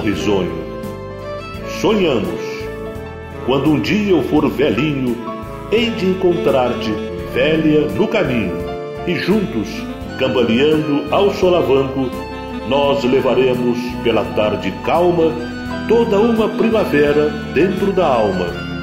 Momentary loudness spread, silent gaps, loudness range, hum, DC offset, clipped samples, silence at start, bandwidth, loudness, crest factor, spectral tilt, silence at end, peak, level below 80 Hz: 12 LU; none; 2 LU; none; 0.1%; under 0.1%; 0 s; 16 kHz; -17 LUFS; 14 dB; -6.5 dB/octave; 0 s; -2 dBFS; -38 dBFS